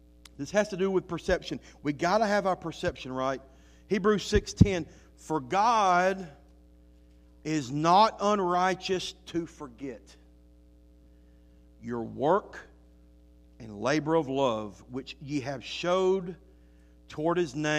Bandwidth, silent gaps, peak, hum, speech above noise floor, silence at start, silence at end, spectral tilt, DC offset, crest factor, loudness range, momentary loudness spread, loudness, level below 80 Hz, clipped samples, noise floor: 14.5 kHz; none; -6 dBFS; none; 28 dB; 0.4 s; 0 s; -5.5 dB/octave; under 0.1%; 24 dB; 8 LU; 18 LU; -28 LUFS; -48 dBFS; under 0.1%; -56 dBFS